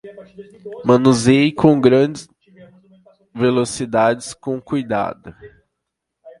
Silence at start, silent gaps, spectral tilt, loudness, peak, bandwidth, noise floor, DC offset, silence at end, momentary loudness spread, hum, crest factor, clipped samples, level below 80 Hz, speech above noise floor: 0.05 s; none; -6 dB/octave; -16 LUFS; 0 dBFS; 11.5 kHz; -78 dBFS; under 0.1%; 0.1 s; 22 LU; none; 18 dB; under 0.1%; -54 dBFS; 62 dB